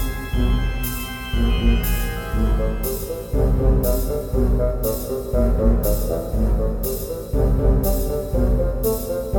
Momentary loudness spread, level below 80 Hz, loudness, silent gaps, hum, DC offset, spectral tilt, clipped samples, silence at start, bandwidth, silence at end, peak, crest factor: 6 LU; -22 dBFS; -22 LUFS; none; none; under 0.1%; -6.5 dB/octave; under 0.1%; 0 s; 17.5 kHz; 0 s; -4 dBFS; 14 dB